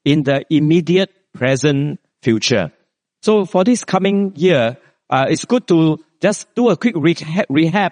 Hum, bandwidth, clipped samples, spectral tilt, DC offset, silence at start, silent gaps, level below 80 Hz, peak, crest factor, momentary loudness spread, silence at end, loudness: none; 10 kHz; under 0.1%; -5.5 dB/octave; under 0.1%; 0.05 s; none; -58 dBFS; 0 dBFS; 16 dB; 6 LU; 0 s; -16 LUFS